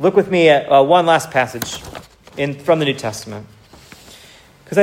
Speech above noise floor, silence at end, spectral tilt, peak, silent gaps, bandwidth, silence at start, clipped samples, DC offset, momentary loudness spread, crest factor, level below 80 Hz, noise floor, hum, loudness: 29 dB; 0 s; -5 dB/octave; 0 dBFS; none; 16 kHz; 0 s; under 0.1%; under 0.1%; 22 LU; 16 dB; -52 dBFS; -45 dBFS; none; -15 LUFS